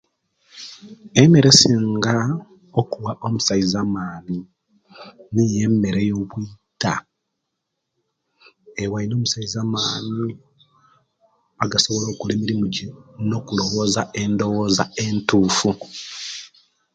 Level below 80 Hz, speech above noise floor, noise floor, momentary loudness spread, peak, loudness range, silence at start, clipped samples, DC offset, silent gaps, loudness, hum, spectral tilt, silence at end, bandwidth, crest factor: -52 dBFS; 58 dB; -78 dBFS; 15 LU; 0 dBFS; 9 LU; 0.55 s; under 0.1%; under 0.1%; none; -20 LUFS; none; -4.5 dB/octave; 0.5 s; 9.4 kHz; 22 dB